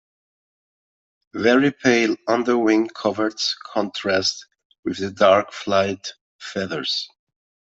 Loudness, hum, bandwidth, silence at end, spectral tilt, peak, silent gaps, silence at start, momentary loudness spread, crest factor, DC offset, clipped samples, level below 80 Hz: -20 LUFS; none; 8 kHz; 0.7 s; -4 dB/octave; -2 dBFS; 4.65-4.70 s, 4.79-4.83 s, 6.21-6.39 s; 1.35 s; 15 LU; 20 dB; under 0.1%; under 0.1%; -66 dBFS